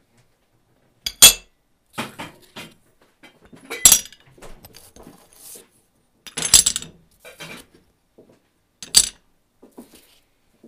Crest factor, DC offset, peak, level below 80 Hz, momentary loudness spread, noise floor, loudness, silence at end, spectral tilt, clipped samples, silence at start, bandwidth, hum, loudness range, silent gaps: 24 dB; under 0.1%; 0 dBFS; -48 dBFS; 28 LU; -63 dBFS; -13 LUFS; 1.6 s; 1 dB/octave; under 0.1%; 1.05 s; 16 kHz; none; 6 LU; none